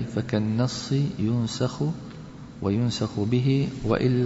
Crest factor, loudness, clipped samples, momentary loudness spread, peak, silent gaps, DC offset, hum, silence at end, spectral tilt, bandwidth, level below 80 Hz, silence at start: 14 dB; -26 LUFS; under 0.1%; 9 LU; -10 dBFS; none; under 0.1%; none; 0 s; -7 dB/octave; 8 kHz; -50 dBFS; 0 s